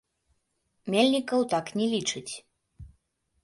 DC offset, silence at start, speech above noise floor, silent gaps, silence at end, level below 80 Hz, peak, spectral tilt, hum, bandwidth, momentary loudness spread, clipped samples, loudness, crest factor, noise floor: under 0.1%; 0.85 s; 49 dB; none; 0.55 s; -62 dBFS; -10 dBFS; -4 dB/octave; none; 11.5 kHz; 17 LU; under 0.1%; -27 LUFS; 20 dB; -76 dBFS